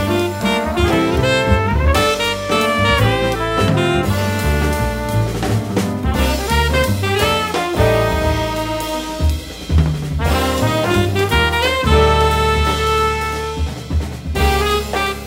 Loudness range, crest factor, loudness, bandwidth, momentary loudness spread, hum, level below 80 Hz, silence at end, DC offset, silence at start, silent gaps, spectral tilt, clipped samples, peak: 2 LU; 16 dB; -16 LUFS; 16.5 kHz; 6 LU; none; -24 dBFS; 0 s; under 0.1%; 0 s; none; -5 dB/octave; under 0.1%; 0 dBFS